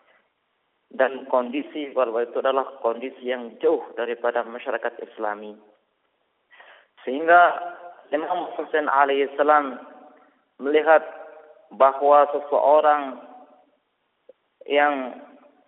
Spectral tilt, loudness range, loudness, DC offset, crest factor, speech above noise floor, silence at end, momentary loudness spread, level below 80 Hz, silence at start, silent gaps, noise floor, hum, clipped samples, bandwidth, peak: -0.5 dB/octave; 8 LU; -22 LUFS; under 0.1%; 20 dB; 51 dB; 0.45 s; 17 LU; -76 dBFS; 0.95 s; none; -72 dBFS; none; under 0.1%; 4 kHz; -4 dBFS